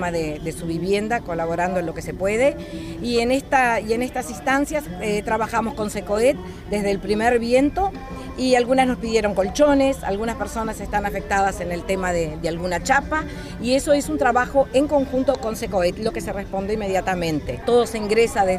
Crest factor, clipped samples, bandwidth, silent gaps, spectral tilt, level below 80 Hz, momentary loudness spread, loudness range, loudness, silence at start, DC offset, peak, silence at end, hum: 18 dB; under 0.1%; 15.5 kHz; none; -5 dB/octave; -38 dBFS; 9 LU; 3 LU; -21 LUFS; 0 s; under 0.1%; -4 dBFS; 0 s; none